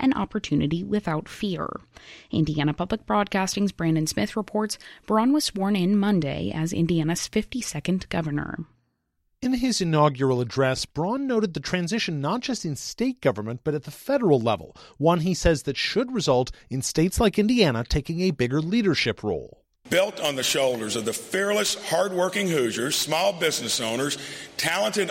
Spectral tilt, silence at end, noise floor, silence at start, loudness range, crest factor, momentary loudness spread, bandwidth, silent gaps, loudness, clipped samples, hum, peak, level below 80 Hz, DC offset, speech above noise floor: -4.5 dB/octave; 0 s; -73 dBFS; 0 s; 3 LU; 18 dB; 8 LU; 16.5 kHz; none; -24 LUFS; under 0.1%; none; -6 dBFS; -44 dBFS; under 0.1%; 49 dB